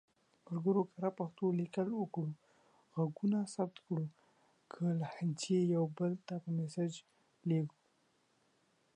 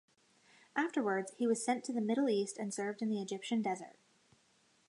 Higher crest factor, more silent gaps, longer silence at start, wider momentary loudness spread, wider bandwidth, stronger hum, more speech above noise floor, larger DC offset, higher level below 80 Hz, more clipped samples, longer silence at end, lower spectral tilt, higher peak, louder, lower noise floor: about the same, 16 dB vs 18 dB; neither; second, 0.5 s vs 0.75 s; first, 10 LU vs 6 LU; about the same, 10 kHz vs 11 kHz; neither; about the same, 39 dB vs 36 dB; neither; first, -84 dBFS vs -90 dBFS; neither; first, 1.25 s vs 0.95 s; first, -7.5 dB/octave vs -4.5 dB/octave; second, -22 dBFS vs -18 dBFS; about the same, -38 LUFS vs -36 LUFS; about the same, -75 dBFS vs -72 dBFS